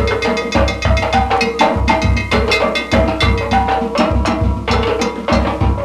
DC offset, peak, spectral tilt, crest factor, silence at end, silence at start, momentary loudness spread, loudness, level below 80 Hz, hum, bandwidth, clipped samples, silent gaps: under 0.1%; 0 dBFS; -5.5 dB/octave; 14 dB; 0 s; 0 s; 3 LU; -15 LUFS; -22 dBFS; none; 12 kHz; under 0.1%; none